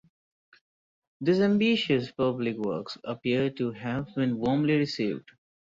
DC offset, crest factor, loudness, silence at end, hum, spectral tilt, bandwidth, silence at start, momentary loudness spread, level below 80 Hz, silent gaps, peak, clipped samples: under 0.1%; 16 dB; -27 LUFS; 0.6 s; none; -7 dB/octave; 7.6 kHz; 1.2 s; 9 LU; -64 dBFS; none; -12 dBFS; under 0.1%